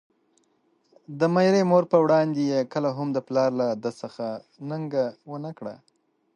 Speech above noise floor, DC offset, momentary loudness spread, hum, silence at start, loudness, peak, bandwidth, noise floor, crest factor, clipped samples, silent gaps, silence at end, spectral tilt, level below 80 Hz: 43 dB; under 0.1%; 17 LU; none; 1.1 s; -24 LUFS; -6 dBFS; 9.4 kHz; -67 dBFS; 20 dB; under 0.1%; none; 0.6 s; -7 dB/octave; -74 dBFS